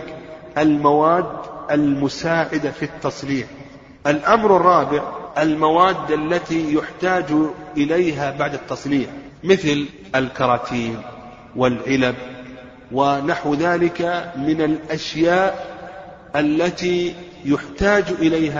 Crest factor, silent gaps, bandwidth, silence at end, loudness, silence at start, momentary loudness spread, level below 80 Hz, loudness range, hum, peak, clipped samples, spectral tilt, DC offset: 20 dB; none; 7.6 kHz; 0 s; -19 LUFS; 0 s; 15 LU; -48 dBFS; 4 LU; none; 0 dBFS; under 0.1%; -6 dB/octave; under 0.1%